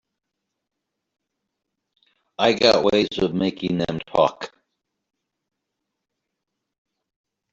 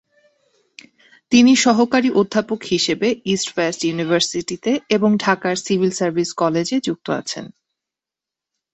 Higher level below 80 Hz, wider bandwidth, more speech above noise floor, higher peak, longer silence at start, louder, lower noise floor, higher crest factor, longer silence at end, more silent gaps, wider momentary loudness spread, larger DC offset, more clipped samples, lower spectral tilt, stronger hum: about the same, -58 dBFS vs -60 dBFS; about the same, 7.8 kHz vs 8.4 kHz; second, 61 dB vs 69 dB; about the same, -2 dBFS vs -2 dBFS; first, 2.4 s vs 1.3 s; about the same, -20 LUFS vs -18 LUFS; second, -81 dBFS vs -87 dBFS; about the same, 22 dB vs 18 dB; first, 3.05 s vs 1.25 s; neither; first, 16 LU vs 9 LU; neither; neither; about the same, -5 dB/octave vs -4 dB/octave; neither